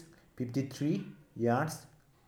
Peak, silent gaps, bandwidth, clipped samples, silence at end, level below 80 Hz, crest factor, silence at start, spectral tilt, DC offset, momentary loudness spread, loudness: -18 dBFS; none; 18.5 kHz; under 0.1%; 0.4 s; -70 dBFS; 18 dB; 0 s; -6.5 dB/octave; under 0.1%; 13 LU; -34 LUFS